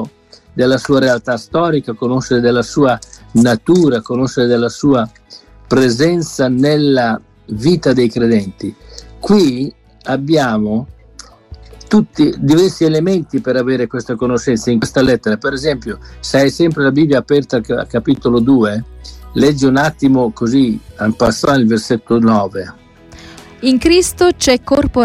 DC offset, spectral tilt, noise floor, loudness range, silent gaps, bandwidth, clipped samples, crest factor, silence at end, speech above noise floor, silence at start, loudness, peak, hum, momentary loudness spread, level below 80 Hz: under 0.1%; -5.5 dB/octave; -41 dBFS; 2 LU; none; 15 kHz; under 0.1%; 14 dB; 0 s; 28 dB; 0 s; -13 LUFS; 0 dBFS; none; 10 LU; -38 dBFS